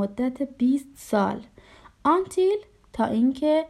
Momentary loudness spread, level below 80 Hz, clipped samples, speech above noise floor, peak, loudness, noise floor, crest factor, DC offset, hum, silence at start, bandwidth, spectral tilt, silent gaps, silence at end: 7 LU; -58 dBFS; under 0.1%; 28 dB; -10 dBFS; -25 LUFS; -51 dBFS; 14 dB; under 0.1%; none; 0 s; 13.5 kHz; -6.5 dB/octave; none; 0 s